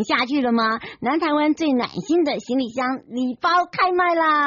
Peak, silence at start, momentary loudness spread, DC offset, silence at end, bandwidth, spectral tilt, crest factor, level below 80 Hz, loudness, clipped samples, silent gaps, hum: -8 dBFS; 0 s; 7 LU; under 0.1%; 0 s; 7.2 kHz; -2 dB/octave; 14 dB; -62 dBFS; -21 LUFS; under 0.1%; none; none